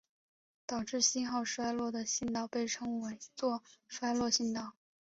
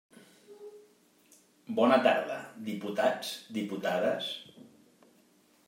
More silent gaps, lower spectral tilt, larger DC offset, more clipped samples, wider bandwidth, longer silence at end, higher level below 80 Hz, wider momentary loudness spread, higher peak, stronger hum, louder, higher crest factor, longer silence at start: neither; second, -2.5 dB/octave vs -4.5 dB/octave; neither; neither; second, 8 kHz vs 16 kHz; second, 0.3 s vs 1 s; first, -70 dBFS vs -86 dBFS; second, 12 LU vs 26 LU; second, -16 dBFS vs -10 dBFS; neither; second, -35 LUFS vs -30 LUFS; about the same, 20 dB vs 22 dB; first, 0.7 s vs 0.5 s